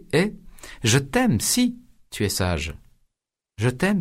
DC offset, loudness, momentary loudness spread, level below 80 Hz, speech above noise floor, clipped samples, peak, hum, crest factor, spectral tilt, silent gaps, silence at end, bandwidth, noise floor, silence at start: under 0.1%; -23 LUFS; 18 LU; -44 dBFS; 63 dB; under 0.1%; -4 dBFS; none; 20 dB; -4.5 dB/octave; none; 0 s; 16 kHz; -85 dBFS; 0.1 s